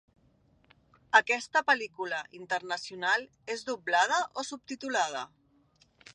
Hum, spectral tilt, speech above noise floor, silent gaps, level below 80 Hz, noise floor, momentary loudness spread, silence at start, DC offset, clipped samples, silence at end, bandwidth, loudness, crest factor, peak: none; -1 dB/octave; 36 dB; none; -76 dBFS; -66 dBFS; 13 LU; 1.15 s; under 0.1%; under 0.1%; 0.9 s; 11 kHz; -30 LUFS; 24 dB; -8 dBFS